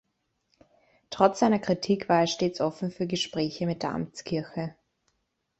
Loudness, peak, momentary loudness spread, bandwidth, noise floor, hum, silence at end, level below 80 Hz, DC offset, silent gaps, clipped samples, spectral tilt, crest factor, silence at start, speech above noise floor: -27 LUFS; -4 dBFS; 11 LU; 8.2 kHz; -77 dBFS; none; 0.9 s; -64 dBFS; under 0.1%; none; under 0.1%; -5.5 dB/octave; 24 dB; 1.1 s; 51 dB